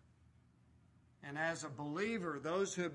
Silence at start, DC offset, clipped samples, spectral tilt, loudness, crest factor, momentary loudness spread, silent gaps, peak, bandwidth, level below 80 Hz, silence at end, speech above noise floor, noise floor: 1.2 s; under 0.1%; under 0.1%; -4.5 dB/octave; -40 LUFS; 18 dB; 8 LU; none; -24 dBFS; 11.5 kHz; -78 dBFS; 0 s; 28 dB; -68 dBFS